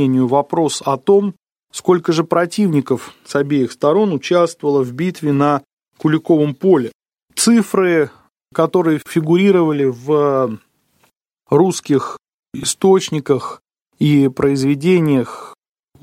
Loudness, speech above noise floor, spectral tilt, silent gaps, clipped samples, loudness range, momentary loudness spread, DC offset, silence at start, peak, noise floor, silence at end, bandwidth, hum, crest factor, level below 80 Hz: -16 LUFS; 46 dB; -6 dB/octave; 5.73-5.77 s, 6.95-7.00 s, 12.34-12.43 s; under 0.1%; 2 LU; 9 LU; under 0.1%; 0 s; -2 dBFS; -61 dBFS; 0.5 s; 16 kHz; none; 14 dB; -58 dBFS